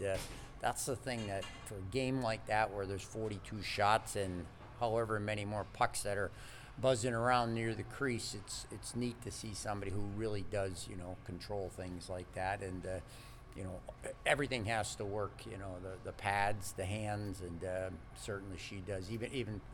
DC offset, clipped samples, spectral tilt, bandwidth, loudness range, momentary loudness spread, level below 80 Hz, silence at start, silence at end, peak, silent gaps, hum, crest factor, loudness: under 0.1%; under 0.1%; -4.5 dB/octave; 18.5 kHz; 6 LU; 13 LU; -56 dBFS; 0 s; 0 s; -16 dBFS; none; none; 24 dB; -39 LUFS